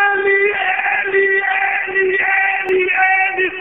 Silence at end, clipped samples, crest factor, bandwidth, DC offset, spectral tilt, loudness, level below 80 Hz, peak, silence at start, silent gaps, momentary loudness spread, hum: 0 s; under 0.1%; 12 dB; 3.9 kHz; 0.3%; 0 dB/octave; -14 LUFS; -60 dBFS; -2 dBFS; 0 s; none; 3 LU; none